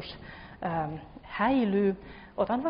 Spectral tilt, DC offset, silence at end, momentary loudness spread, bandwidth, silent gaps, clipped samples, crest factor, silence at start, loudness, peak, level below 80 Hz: -5.5 dB/octave; under 0.1%; 0 s; 18 LU; 5.4 kHz; none; under 0.1%; 16 dB; 0 s; -30 LUFS; -14 dBFS; -54 dBFS